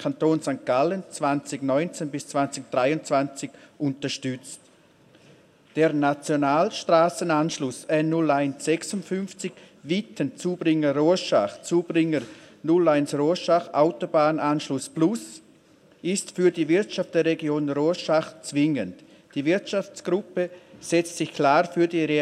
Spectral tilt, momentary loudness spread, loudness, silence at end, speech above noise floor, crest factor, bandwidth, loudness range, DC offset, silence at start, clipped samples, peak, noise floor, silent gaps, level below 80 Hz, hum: -5.5 dB/octave; 11 LU; -24 LUFS; 0 s; 33 dB; 18 dB; 13 kHz; 4 LU; under 0.1%; 0 s; under 0.1%; -6 dBFS; -56 dBFS; none; -76 dBFS; none